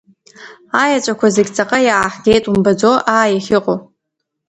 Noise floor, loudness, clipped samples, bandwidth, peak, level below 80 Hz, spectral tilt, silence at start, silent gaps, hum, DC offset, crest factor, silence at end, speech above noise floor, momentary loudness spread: -76 dBFS; -14 LUFS; under 0.1%; 11 kHz; 0 dBFS; -46 dBFS; -4.5 dB/octave; 0.4 s; none; none; under 0.1%; 14 dB; 0.65 s; 62 dB; 4 LU